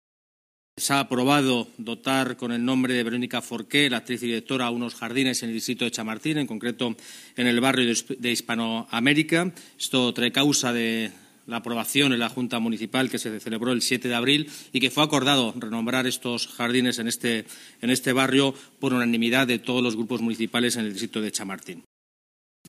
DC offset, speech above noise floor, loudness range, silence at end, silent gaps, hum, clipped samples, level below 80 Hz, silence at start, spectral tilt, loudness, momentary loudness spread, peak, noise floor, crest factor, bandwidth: under 0.1%; over 65 dB; 2 LU; 0.9 s; none; none; under 0.1%; -70 dBFS; 0.75 s; -3.5 dB/octave; -24 LUFS; 9 LU; -4 dBFS; under -90 dBFS; 20 dB; 15.5 kHz